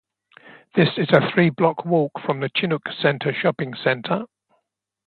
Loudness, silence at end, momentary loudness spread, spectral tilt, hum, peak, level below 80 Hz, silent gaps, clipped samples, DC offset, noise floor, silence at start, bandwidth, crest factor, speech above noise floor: -21 LUFS; 0.8 s; 8 LU; -9 dB/octave; none; 0 dBFS; -64 dBFS; none; under 0.1%; under 0.1%; -75 dBFS; 0.5 s; 4.7 kHz; 22 dB; 55 dB